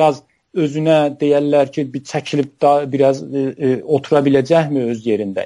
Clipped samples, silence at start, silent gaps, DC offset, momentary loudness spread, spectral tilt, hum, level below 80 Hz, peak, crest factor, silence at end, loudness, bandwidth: under 0.1%; 0 s; none; under 0.1%; 8 LU; -7 dB/octave; none; -60 dBFS; -2 dBFS; 14 dB; 0 s; -16 LUFS; 11.5 kHz